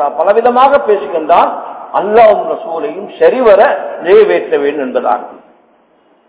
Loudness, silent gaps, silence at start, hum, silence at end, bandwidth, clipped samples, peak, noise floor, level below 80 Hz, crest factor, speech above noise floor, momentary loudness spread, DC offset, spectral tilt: -10 LUFS; none; 0 s; none; 0.9 s; 4 kHz; 3%; 0 dBFS; -50 dBFS; -52 dBFS; 10 dB; 40 dB; 11 LU; under 0.1%; -8.5 dB/octave